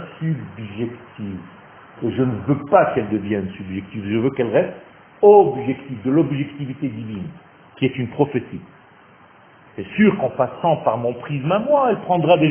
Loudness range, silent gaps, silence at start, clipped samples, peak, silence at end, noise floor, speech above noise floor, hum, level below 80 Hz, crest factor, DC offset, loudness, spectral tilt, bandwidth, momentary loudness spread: 6 LU; none; 0 s; under 0.1%; 0 dBFS; 0 s; -48 dBFS; 30 dB; none; -54 dBFS; 20 dB; under 0.1%; -20 LUFS; -11.5 dB/octave; 3.5 kHz; 16 LU